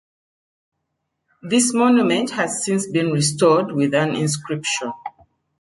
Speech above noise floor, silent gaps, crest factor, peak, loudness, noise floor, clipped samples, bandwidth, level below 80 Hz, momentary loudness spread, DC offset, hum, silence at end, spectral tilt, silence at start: 57 dB; none; 18 dB; -4 dBFS; -19 LUFS; -76 dBFS; under 0.1%; 11.5 kHz; -64 dBFS; 9 LU; under 0.1%; none; 0.5 s; -4.5 dB/octave; 1.45 s